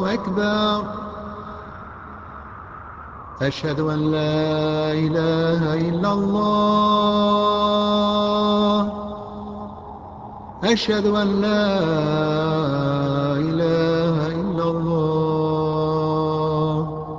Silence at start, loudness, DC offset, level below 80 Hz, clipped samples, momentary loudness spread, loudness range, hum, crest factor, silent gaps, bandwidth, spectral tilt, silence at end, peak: 0 s; -20 LUFS; under 0.1%; -46 dBFS; under 0.1%; 19 LU; 7 LU; none; 14 dB; none; 7.4 kHz; -7 dB/octave; 0 s; -6 dBFS